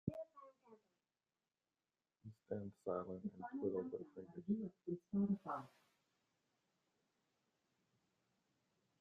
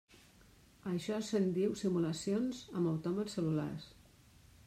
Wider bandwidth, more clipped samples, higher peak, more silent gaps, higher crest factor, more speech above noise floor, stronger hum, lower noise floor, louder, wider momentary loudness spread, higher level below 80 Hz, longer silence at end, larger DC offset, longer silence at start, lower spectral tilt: second, 4.9 kHz vs 14.5 kHz; neither; second, -26 dBFS vs -22 dBFS; neither; first, 22 dB vs 14 dB; first, over 45 dB vs 28 dB; neither; first, under -90 dBFS vs -63 dBFS; second, -46 LUFS vs -36 LUFS; first, 21 LU vs 9 LU; second, -82 dBFS vs -68 dBFS; first, 3.3 s vs 0.75 s; neither; second, 0.05 s vs 0.85 s; first, -10.5 dB/octave vs -6.5 dB/octave